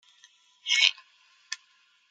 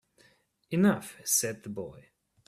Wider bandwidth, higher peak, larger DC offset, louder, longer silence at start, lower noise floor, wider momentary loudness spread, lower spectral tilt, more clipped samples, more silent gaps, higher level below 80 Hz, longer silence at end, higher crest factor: second, 13.5 kHz vs 15.5 kHz; first, -2 dBFS vs -12 dBFS; neither; first, -23 LUFS vs -29 LUFS; about the same, 0.65 s vs 0.7 s; about the same, -65 dBFS vs -65 dBFS; first, 18 LU vs 14 LU; second, 9 dB/octave vs -4 dB/octave; neither; neither; second, under -90 dBFS vs -70 dBFS; about the same, 0.55 s vs 0.5 s; first, 30 dB vs 20 dB